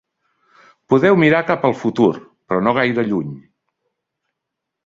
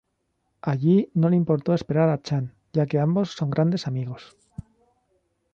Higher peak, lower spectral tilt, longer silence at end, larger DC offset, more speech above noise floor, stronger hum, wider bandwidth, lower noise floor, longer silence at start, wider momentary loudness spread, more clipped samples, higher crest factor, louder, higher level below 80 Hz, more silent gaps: first, -2 dBFS vs -8 dBFS; about the same, -7.5 dB/octave vs -8.5 dB/octave; first, 1.45 s vs 1.3 s; neither; first, 64 dB vs 52 dB; neither; about the same, 7.6 kHz vs 7.4 kHz; first, -80 dBFS vs -74 dBFS; first, 0.9 s vs 0.65 s; second, 10 LU vs 19 LU; neither; about the same, 18 dB vs 16 dB; first, -16 LUFS vs -23 LUFS; about the same, -58 dBFS vs -58 dBFS; neither